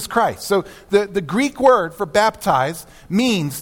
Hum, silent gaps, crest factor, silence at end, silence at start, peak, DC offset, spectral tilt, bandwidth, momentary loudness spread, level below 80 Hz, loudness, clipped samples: none; none; 16 dB; 0 s; 0 s; -2 dBFS; under 0.1%; -4.5 dB/octave; 18 kHz; 7 LU; -50 dBFS; -18 LUFS; under 0.1%